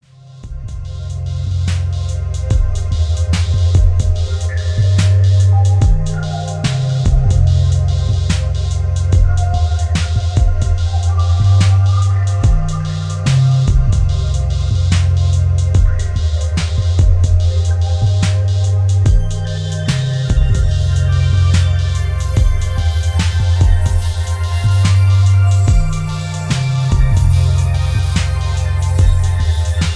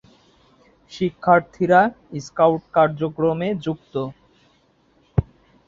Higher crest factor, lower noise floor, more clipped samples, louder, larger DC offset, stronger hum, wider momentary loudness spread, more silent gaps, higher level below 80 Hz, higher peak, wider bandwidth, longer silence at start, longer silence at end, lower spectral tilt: second, 12 dB vs 20 dB; second, -35 dBFS vs -60 dBFS; neither; first, -15 LUFS vs -20 LUFS; neither; neither; second, 7 LU vs 13 LU; neither; first, -18 dBFS vs -44 dBFS; about the same, 0 dBFS vs -2 dBFS; first, 11 kHz vs 7.6 kHz; second, 0.25 s vs 0.9 s; second, 0 s vs 0.45 s; second, -6 dB/octave vs -7.5 dB/octave